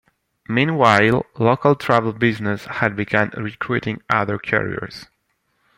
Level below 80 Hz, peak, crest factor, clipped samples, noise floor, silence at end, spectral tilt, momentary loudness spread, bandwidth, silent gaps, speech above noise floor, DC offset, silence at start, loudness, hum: -54 dBFS; 0 dBFS; 20 dB; under 0.1%; -68 dBFS; 0.75 s; -6.5 dB/octave; 11 LU; 16 kHz; none; 50 dB; under 0.1%; 0.5 s; -19 LUFS; none